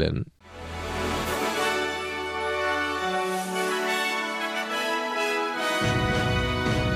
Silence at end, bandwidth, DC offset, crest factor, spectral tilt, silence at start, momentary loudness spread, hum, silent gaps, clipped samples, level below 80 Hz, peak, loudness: 0 s; 15.5 kHz; under 0.1%; 18 dB; -4.5 dB/octave; 0 s; 6 LU; none; none; under 0.1%; -42 dBFS; -8 dBFS; -26 LUFS